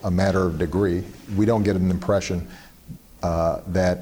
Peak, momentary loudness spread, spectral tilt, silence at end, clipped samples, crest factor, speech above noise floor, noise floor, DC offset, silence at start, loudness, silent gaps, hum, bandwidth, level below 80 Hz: -10 dBFS; 15 LU; -7 dB/octave; 0 s; under 0.1%; 14 dB; 21 dB; -43 dBFS; under 0.1%; 0 s; -23 LUFS; none; none; over 20 kHz; -42 dBFS